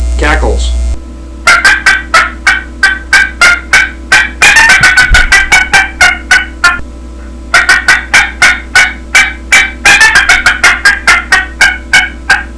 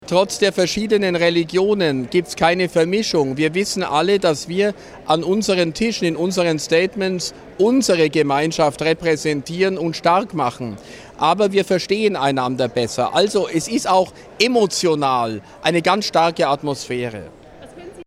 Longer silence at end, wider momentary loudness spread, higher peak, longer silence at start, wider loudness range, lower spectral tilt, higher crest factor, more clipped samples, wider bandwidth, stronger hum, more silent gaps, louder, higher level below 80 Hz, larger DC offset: about the same, 0 s vs 0.05 s; about the same, 7 LU vs 7 LU; about the same, 0 dBFS vs 0 dBFS; about the same, 0 s vs 0 s; about the same, 3 LU vs 2 LU; second, -1.5 dB/octave vs -4.5 dB/octave; second, 8 dB vs 18 dB; first, 6% vs under 0.1%; second, 11 kHz vs 15.5 kHz; neither; neither; first, -5 LUFS vs -18 LUFS; first, -18 dBFS vs -52 dBFS; first, 1% vs under 0.1%